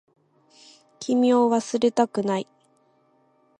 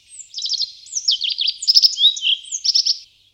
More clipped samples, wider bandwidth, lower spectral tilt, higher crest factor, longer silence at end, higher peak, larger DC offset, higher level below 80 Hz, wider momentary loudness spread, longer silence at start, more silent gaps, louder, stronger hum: neither; second, 10 kHz vs 17.5 kHz; first, -5.5 dB/octave vs 7 dB/octave; about the same, 18 dB vs 20 dB; first, 1.15 s vs 0.3 s; second, -6 dBFS vs 0 dBFS; neither; second, -74 dBFS vs -68 dBFS; about the same, 13 LU vs 12 LU; first, 1 s vs 0.1 s; neither; second, -22 LUFS vs -16 LUFS; neither